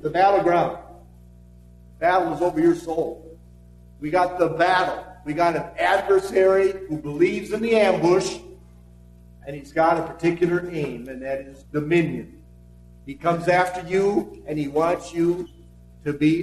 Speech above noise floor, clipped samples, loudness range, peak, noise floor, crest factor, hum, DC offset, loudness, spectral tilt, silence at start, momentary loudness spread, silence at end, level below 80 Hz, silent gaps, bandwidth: 26 dB; under 0.1%; 5 LU; -6 dBFS; -47 dBFS; 16 dB; 60 Hz at -50 dBFS; under 0.1%; -22 LUFS; -6 dB/octave; 0.05 s; 14 LU; 0 s; -50 dBFS; none; 13 kHz